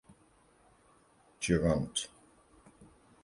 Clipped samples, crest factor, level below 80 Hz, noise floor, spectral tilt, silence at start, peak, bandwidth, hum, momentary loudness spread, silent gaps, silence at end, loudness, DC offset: under 0.1%; 24 dB; -52 dBFS; -66 dBFS; -5 dB/octave; 1.4 s; -14 dBFS; 11.5 kHz; none; 11 LU; none; 0.4 s; -33 LUFS; under 0.1%